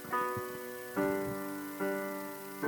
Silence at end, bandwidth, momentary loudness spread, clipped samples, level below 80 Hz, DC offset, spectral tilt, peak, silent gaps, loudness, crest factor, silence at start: 0 s; 19 kHz; 7 LU; under 0.1%; -68 dBFS; under 0.1%; -5 dB/octave; -20 dBFS; none; -37 LUFS; 18 dB; 0 s